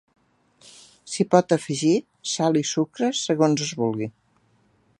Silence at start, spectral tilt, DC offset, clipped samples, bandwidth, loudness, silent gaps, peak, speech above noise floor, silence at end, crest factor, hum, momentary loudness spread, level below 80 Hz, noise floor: 1.05 s; -5 dB/octave; under 0.1%; under 0.1%; 11.5 kHz; -23 LUFS; none; -2 dBFS; 41 dB; 0.9 s; 22 dB; none; 9 LU; -70 dBFS; -63 dBFS